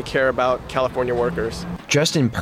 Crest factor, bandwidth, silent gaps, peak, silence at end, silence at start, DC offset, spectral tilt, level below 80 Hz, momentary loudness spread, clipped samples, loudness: 14 dB; 16 kHz; none; -6 dBFS; 0 s; 0 s; under 0.1%; -4.5 dB/octave; -42 dBFS; 8 LU; under 0.1%; -21 LUFS